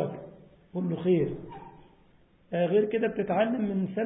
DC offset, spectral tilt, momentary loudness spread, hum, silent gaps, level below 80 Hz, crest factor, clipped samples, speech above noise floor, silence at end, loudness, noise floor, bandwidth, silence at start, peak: under 0.1%; -11.5 dB/octave; 19 LU; none; none; -62 dBFS; 16 dB; under 0.1%; 33 dB; 0 s; -28 LUFS; -60 dBFS; 3.9 kHz; 0 s; -14 dBFS